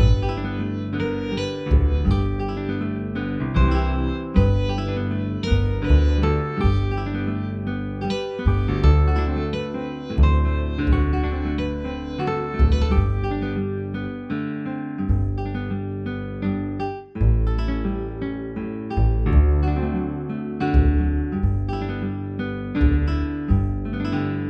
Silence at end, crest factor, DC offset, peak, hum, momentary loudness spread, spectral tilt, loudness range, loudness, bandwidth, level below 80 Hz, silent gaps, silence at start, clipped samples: 0 s; 18 dB; under 0.1%; -4 dBFS; none; 9 LU; -8.5 dB/octave; 4 LU; -23 LUFS; 6.2 kHz; -24 dBFS; none; 0 s; under 0.1%